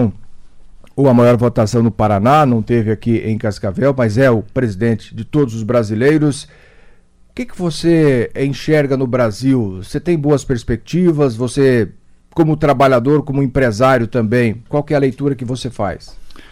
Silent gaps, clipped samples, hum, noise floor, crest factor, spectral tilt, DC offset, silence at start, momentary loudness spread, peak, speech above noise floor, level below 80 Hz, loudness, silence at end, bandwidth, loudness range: none; under 0.1%; none; -45 dBFS; 12 dB; -7.5 dB/octave; under 0.1%; 0 s; 10 LU; -2 dBFS; 31 dB; -38 dBFS; -15 LUFS; 0.1 s; 15 kHz; 3 LU